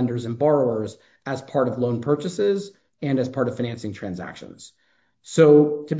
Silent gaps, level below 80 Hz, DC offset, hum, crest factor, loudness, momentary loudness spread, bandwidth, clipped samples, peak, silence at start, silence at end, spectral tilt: none; -60 dBFS; under 0.1%; none; 20 dB; -22 LUFS; 19 LU; 8 kHz; under 0.1%; -2 dBFS; 0 s; 0 s; -7 dB/octave